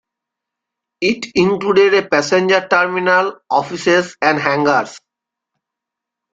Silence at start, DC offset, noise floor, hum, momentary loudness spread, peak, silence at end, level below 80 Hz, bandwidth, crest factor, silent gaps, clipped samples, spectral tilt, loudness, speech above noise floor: 1 s; under 0.1%; -83 dBFS; none; 6 LU; -2 dBFS; 1.35 s; -58 dBFS; 7.8 kHz; 16 dB; none; under 0.1%; -4.5 dB/octave; -15 LUFS; 68 dB